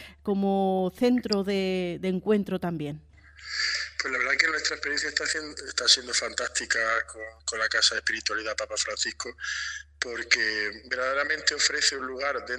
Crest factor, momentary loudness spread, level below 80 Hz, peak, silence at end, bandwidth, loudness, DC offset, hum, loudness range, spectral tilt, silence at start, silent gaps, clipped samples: 24 dB; 10 LU; -56 dBFS; -4 dBFS; 0 s; 14.5 kHz; -26 LUFS; under 0.1%; none; 3 LU; -2.5 dB/octave; 0 s; none; under 0.1%